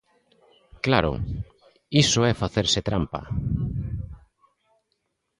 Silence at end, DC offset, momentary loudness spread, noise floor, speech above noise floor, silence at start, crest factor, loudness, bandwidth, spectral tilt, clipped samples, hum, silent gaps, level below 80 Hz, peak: 1.2 s; under 0.1%; 15 LU; -76 dBFS; 53 dB; 0.75 s; 24 dB; -24 LUFS; 11.5 kHz; -4.5 dB/octave; under 0.1%; none; none; -40 dBFS; -2 dBFS